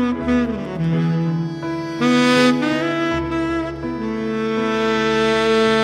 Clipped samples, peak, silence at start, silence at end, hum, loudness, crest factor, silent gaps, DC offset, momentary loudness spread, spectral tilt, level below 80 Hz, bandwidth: under 0.1%; -4 dBFS; 0 s; 0 s; none; -19 LUFS; 14 dB; none; under 0.1%; 9 LU; -6 dB/octave; -42 dBFS; 12.5 kHz